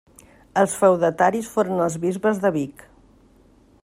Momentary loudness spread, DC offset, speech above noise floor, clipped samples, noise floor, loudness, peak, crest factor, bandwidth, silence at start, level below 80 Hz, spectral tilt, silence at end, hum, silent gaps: 8 LU; under 0.1%; 34 dB; under 0.1%; -54 dBFS; -21 LUFS; -4 dBFS; 18 dB; 16 kHz; 0.55 s; -58 dBFS; -6 dB/octave; 1.15 s; none; none